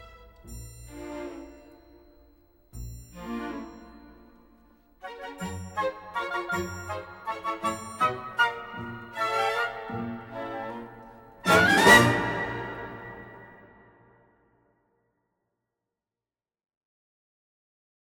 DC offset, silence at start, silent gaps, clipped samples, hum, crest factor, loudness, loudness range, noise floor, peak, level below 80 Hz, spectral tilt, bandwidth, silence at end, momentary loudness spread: under 0.1%; 0 s; none; under 0.1%; none; 26 dB; -26 LUFS; 20 LU; under -90 dBFS; -4 dBFS; -54 dBFS; -4 dB/octave; 16 kHz; 4.35 s; 25 LU